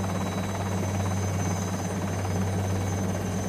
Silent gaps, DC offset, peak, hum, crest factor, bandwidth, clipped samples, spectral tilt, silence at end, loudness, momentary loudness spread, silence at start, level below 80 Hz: none; under 0.1%; -16 dBFS; none; 12 dB; 15.5 kHz; under 0.1%; -5.5 dB/octave; 0 s; -29 LUFS; 2 LU; 0 s; -50 dBFS